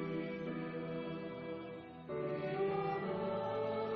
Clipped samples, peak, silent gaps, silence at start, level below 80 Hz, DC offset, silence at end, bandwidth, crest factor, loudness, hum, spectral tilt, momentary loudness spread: under 0.1%; -26 dBFS; none; 0 s; -72 dBFS; under 0.1%; 0 s; 6 kHz; 12 dB; -40 LUFS; none; -6 dB/octave; 8 LU